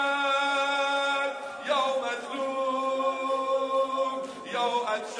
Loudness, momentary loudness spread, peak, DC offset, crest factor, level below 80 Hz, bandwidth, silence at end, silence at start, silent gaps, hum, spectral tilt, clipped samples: -28 LUFS; 7 LU; -14 dBFS; under 0.1%; 14 dB; -80 dBFS; 10.5 kHz; 0 s; 0 s; none; none; -2 dB/octave; under 0.1%